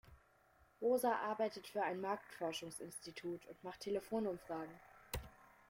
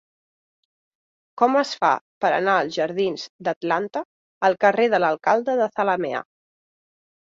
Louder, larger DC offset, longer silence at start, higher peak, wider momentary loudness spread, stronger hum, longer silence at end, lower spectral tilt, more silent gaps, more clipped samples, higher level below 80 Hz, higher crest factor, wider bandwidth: second, -43 LUFS vs -22 LUFS; neither; second, 0.05 s vs 1.35 s; second, -24 dBFS vs -4 dBFS; first, 13 LU vs 10 LU; neither; second, 0.25 s vs 1.1 s; about the same, -4.5 dB/octave vs -5 dB/octave; second, none vs 2.01-2.21 s, 3.29-3.39 s, 3.56-3.61 s, 4.05-4.41 s; neither; first, -64 dBFS vs -72 dBFS; about the same, 18 dB vs 20 dB; first, 16.5 kHz vs 7.8 kHz